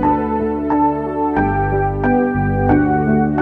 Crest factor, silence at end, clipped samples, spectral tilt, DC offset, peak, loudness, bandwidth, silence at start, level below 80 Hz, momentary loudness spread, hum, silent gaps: 14 dB; 0 s; under 0.1%; -11 dB/octave; under 0.1%; -2 dBFS; -17 LUFS; 4.2 kHz; 0 s; -30 dBFS; 4 LU; none; none